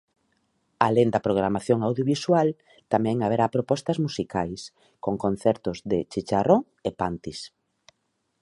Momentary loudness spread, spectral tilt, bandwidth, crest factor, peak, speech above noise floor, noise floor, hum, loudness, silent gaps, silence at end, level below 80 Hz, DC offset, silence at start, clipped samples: 12 LU; -6.5 dB/octave; 11.5 kHz; 24 dB; -2 dBFS; 51 dB; -75 dBFS; none; -25 LUFS; none; 0.95 s; -56 dBFS; under 0.1%; 0.8 s; under 0.1%